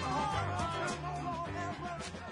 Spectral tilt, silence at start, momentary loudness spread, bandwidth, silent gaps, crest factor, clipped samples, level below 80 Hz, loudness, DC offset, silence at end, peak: -5 dB/octave; 0 s; 7 LU; 11 kHz; none; 14 dB; under 0.1%; -54 dBFS; -37 LUFS; under 0.1%; 0 s; -22 dBFS